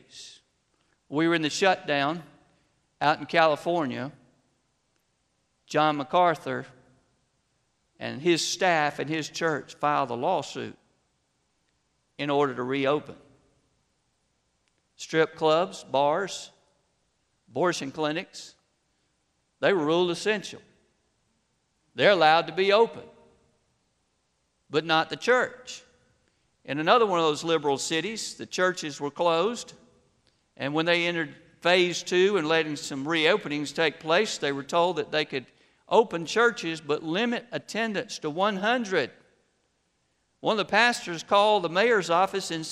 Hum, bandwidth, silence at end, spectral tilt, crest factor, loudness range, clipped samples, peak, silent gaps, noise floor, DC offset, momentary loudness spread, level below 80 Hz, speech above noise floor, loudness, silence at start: none; 13 kHz; 0 s; -4 dB/octave; 22 dB; 5 LU; under 0.1%; -6 dBFS; none; -73 dBFS; under 0.1%; 13 LU; -72 dBFS; 48 dB; -25 LUFS; 0.15 s